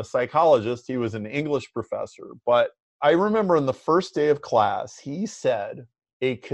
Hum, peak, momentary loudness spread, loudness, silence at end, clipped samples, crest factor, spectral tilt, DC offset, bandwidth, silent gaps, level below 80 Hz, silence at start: none; -6 dBFS; 12 LU; -24 LUFS; 0 s; under 0.1%; 16 dB; -6 dB/octave; under 0.1%; 9 kHz; 2.80-3.00 s, 6.13-6.20 s; -66 dBFS; 0 s